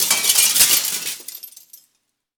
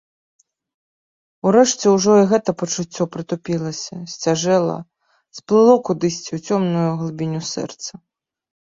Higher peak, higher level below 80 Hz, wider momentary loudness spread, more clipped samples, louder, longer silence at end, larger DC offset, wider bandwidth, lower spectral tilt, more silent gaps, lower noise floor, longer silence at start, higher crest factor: about the same, -2 dBFS vs -2 dBFS; about the same, -60 dBFS vs -60 dBFS; first, 21 LU vs 15 LU; neither; first, -14 LUFS vs -18 LUFS; first, 0.9 s vs 0.75 s; neither; first, over 20 kHz vs 7.8 kHz; second, 2.5 dB/octave vs -5 dB/octave; neither; second, -71 dBFS vs under -90 dBFS; second, 0 s vs 1.45 s; about the same, 20 dB vs 18 dB